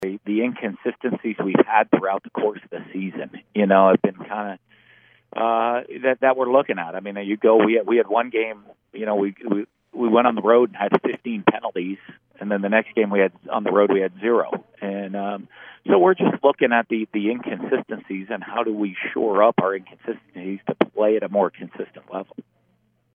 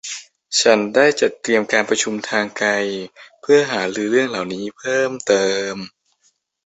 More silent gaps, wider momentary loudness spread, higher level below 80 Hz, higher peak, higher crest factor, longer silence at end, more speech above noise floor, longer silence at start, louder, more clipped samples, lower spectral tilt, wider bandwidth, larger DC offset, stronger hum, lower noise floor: neither; about the same, 16 LU vs 15 LU; second, -76 dBFS vs -64 dBFS; about the same, 0 dBFS vs -2 dBFS; about the same, 20 dB vs 18 dB; about the same, 0.75 s vs 0.75 s; about the same, 44 dB vs 45 dB; about the same, 0 s vs 0.05 s; second, -21 LUFS vs -18 LUFS; neither; first, -9 dB/octave vs -2.5 dB/octave; second, 3.7 kHz vs 8.4 kHz; neither; neither; about the same, -65 dBFS vs -63 dBFS